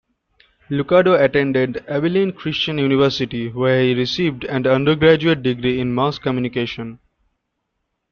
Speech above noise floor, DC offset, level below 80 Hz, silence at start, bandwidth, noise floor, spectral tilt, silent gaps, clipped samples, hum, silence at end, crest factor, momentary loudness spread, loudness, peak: 57 dB; under 0.1%; -50 dBFS; 0.7 s; 6.8 kHz; -74 dBFS; -7 dB/octave; none; under 0.1%; none; 1.15 s; 18 dB; 10 LU; -18 LUFS; -2 dBFS